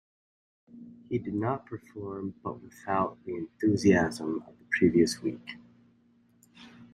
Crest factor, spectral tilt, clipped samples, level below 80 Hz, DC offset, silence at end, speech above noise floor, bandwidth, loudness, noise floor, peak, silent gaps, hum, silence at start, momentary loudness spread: 22 dB; -6 dB/octave; under 0.1%; -62 dBFS; under 0.1%; 0.1 s; 35 dB; 15 kHz; -29 LUFS; -64 dBFS; -8 dBFS; none; none; 0.75 s; 19 LU